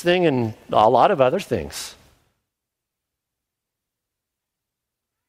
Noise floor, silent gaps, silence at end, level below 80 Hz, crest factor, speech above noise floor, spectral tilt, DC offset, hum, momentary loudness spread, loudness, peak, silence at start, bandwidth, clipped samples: -83 dBFS; none; 3.35 s; -56 dBFS; 20 dB; 65 dB; -5.5 dB/octave; under 0.1%; none; 16 LU; -19 LUFS; -2 dBFS; 0 s; 16 kHz; under 0.1%